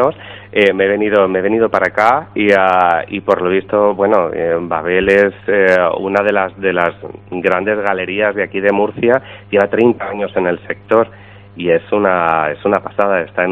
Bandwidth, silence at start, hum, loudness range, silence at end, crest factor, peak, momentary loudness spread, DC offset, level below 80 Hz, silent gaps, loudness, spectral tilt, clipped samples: 8 kHz; 0 s; none; 3 LU; 0 s; 14 dB; 0 dBFS; 6 LU; under 0.1%; -48 dBFS; none; -14 LUFS; -7 dB/octave; 0.1%